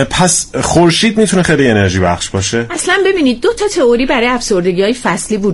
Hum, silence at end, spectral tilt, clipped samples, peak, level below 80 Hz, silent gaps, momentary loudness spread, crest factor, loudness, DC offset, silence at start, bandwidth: none; 0 s; -4 dB/octave; under 0.1%; 0 dBFS; -34 dBFS; none; 5 LU; 12 dB; -11 LUFS; under 0.1%; 0 s; 11.5 kHz